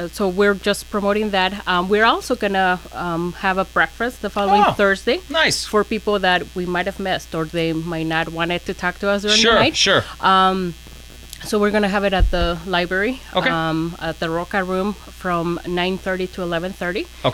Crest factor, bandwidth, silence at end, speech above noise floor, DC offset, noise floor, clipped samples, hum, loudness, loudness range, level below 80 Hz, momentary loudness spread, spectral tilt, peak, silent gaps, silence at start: 16 dB; 17 kHz; 0 s; 19 dB; under 0.1%; -38 dBFS; under 0.1%; none; -19 LUFS; 5 LU; -34 dBFS; 9 LU; -4 dB/octave; -4 dBFS; none; 0 s